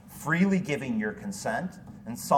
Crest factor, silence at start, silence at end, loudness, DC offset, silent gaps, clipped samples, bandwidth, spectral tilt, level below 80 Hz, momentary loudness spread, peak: 20 dB; 0.05 s; 0 s; -29 LUFS; under 0.1%; none; under 0.1%; 17.5 kHz; -6 dB/octave; -60 dBFS; 15 LU; -8 dBFS